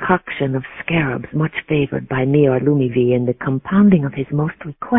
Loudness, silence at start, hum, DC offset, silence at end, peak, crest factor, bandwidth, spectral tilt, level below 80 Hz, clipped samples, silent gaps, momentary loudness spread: -18 LUFS; 0 s; none; under 0.1%; 0 s; 0 dBFS; 16 dB; 3.8 kHz; -12 dB/octave; -46 dBFS; under 0.1%; none; 8 LU